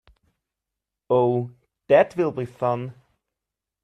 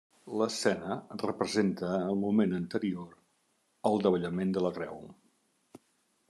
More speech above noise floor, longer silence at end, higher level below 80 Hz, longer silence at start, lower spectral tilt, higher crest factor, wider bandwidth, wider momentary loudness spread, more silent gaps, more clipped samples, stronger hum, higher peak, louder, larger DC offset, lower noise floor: first, 65 dB vs 43 dB; first, 0.9 s vs 0.5 s; first, -64 dBFS vs -76 dBFS; first, 1.1 s vs 0.25 s; first, -8.5 dB/octave vs -6 dB/octave; about the same, 20 dB vs 20 dB; second, 9.2 kHz vs 12.5 kHz; about the same, 12 LU vs 12 LU; neither; neither; neither; first, -4 dBFS vs -12 dBFS; first, -22 LUFS vs -31 LUFS; neither; first, -86 dBFS vs -74 dBFS